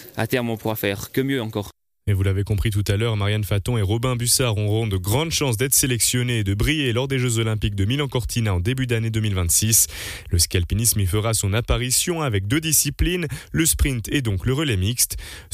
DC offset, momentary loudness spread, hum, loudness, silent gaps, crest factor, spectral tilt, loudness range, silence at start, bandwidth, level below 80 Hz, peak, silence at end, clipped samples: under 0.1%; 6 LU; none; -21 LUFS; none; 16 dB; -4 dB/octave; 3 LU; 0 s; 15.5 kHz; -34 dBFS; -4 dBFS; 0.1 s; under 0.1%